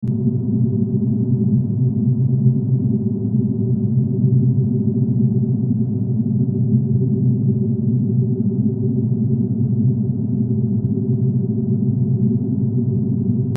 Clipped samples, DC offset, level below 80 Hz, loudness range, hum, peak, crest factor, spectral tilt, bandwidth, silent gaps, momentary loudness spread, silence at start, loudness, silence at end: under 0.1%; under 0.1%; -52 dBFS; 1 LU; none; -4 dBFS; 14 dB; -18 dB/octave; 1 kHz; none; 3 LU; 0 s; -18 LUFS; 0 s